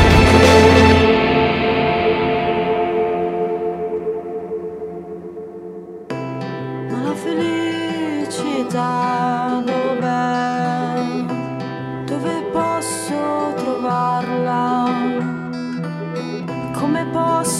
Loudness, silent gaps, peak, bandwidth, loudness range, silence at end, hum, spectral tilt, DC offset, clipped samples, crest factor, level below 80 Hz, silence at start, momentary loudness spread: -18 LUFS; none; 0 dBFS; 15.5 kHz; 9 LU; 0 s; none; -5.5 dB/octave; under 0.1%; under 0.1%; 18 dB; -34 dBFS; 0 s; 14 LU